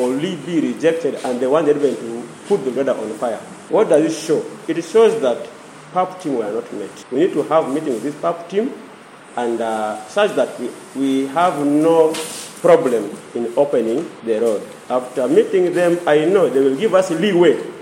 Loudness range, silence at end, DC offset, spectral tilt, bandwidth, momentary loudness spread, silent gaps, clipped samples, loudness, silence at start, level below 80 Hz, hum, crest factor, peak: 5 LU; 0 s; under 0.1%; -5.5 dB/octave; 16 kHz; 12 LU; none; under 0.1%; -18 LUFS; 0 s; -72 dBFS; none; 16 dB; -2 dBFS